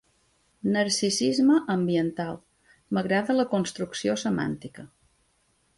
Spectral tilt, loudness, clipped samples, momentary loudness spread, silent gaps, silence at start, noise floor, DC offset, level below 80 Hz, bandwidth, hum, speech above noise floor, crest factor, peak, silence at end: -4.5 dB/octave; -26 LUFS; under 0.1%; 12 LU; none; 0.65 s; -68 dBFS; under 0.1%; -64 dBFS; 11.5 kHz; none; 43 dB; 16 dB; -10 dBFS; 0.9 s